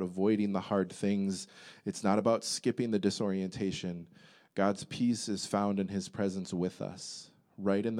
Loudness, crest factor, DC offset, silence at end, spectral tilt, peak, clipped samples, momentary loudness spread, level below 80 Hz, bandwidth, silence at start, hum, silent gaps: -33 LUFS; 20 dB; under 0.1%; 0 s; -5.5 dB/octave; -14 dBFS; under 0.1%; 11 LU; -74 dBFS; 13 kHz; 0 s; none; none